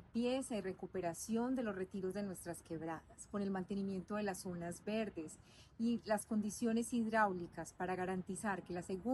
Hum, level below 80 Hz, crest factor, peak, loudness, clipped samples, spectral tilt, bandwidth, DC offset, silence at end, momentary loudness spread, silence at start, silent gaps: none; -68 dBFS; 18 dB; -22 dBFS; -41 LUFS; under 0.1%; -5.5 dB/octave; 12.5 kHz; under 0.1%; 0 s; 10 LU; 0 s; none